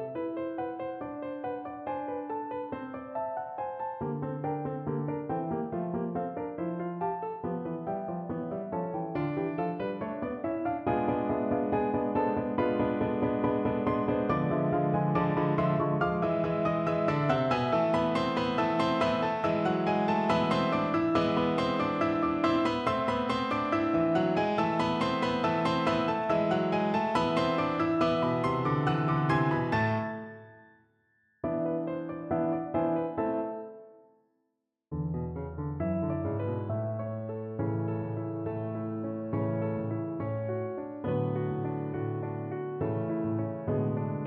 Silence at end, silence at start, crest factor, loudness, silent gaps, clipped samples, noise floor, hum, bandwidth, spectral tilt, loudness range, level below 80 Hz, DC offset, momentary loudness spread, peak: 0 s; 0 s; 16 dB; -30 LUFS; none; under 0.1%; -81 dBFS; none; 9.4 kHz; -8 dB/octave; 7 LU; -60 dBFS; under 0.1%; 9 LU; -14 dBFS